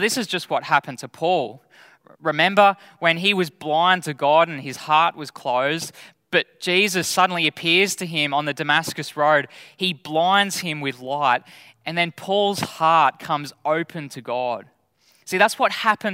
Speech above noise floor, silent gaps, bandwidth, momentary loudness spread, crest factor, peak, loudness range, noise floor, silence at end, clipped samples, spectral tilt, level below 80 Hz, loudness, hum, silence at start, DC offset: 40 dB; none; 16 kHz; 10 LU; 22 dB; 0 dBFS; 3 LU; -61 dBFS; 0 s; under 0.1%; -3.5 dB/octave; -72 dBFS; -20 LUFS; none; 0 s; under 0.1%